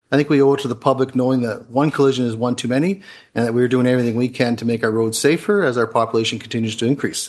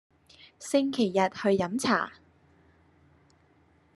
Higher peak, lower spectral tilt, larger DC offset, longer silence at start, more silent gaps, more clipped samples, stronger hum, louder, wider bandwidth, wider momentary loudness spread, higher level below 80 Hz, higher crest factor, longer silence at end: first, 0 dBFS vs -8 dBFS; about the same, -5.5 dB/octave vs -5 dB/octave; neither; second, 0.1 s vs 0.6 s; neither; neither; neither; first, -18 LUFS vs -27 LUFS; about the same, 12.5 kHz vs 12.5 kHz; about the same, 6 LU vs 6 LU; first, -62 dBFS vs -72 dBFS; about the same, 18 dB vs 22 dB; second, 0 s vs 1.85 s